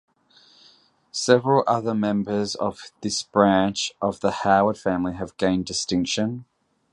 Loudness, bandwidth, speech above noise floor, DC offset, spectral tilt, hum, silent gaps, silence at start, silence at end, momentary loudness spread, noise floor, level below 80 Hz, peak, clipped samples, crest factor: -23 LUFS; 11 kHz; 35 dB; under 0.1%; -4.5 dB/octave; none; none; 1.15 s; 0.5 s; 10 LU; -57 dBFS; -54 dBFS; -2 dBFS; under 0.1%; 22 dB